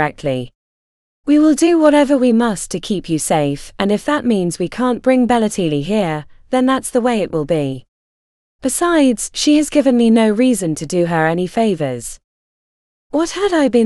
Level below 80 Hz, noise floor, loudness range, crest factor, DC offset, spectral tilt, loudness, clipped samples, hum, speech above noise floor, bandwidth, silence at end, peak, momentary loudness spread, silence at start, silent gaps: -44 dBFS; under -90 dBFS; 4 LU; 16 dB; under 0.1%; -5 dB/octave; -16 LUFS; under 0.1%; none; over 75 dB; 13.5 kHz; 0 s; 0 dBFS; 10 LU; 0 s; 0.55-1.24 s, 7.88-8.59 s, 12.24-13.10 s